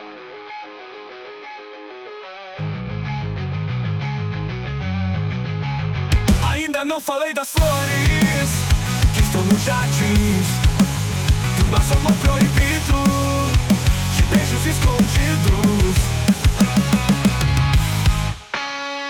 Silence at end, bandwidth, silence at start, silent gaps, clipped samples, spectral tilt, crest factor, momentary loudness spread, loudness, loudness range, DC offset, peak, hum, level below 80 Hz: 0 s; 18 kHz; 0 s; none; under 0.1%; -5 dB/octave; 12 dB; 18 LU; -19 LUFS; 9 LU; under 0.1%; -6 dBFS; none; -24 dBFS